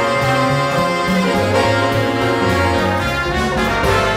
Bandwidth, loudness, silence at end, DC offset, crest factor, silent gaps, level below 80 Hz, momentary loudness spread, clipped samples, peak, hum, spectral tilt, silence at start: 16 kHz; -16 LUFS; 0 s; under 0.1%; 14 dB; none; -34 dBFS; 2 LU; under 0.1%; -2 dBFS; none; -5.5 dB/octave; 0 s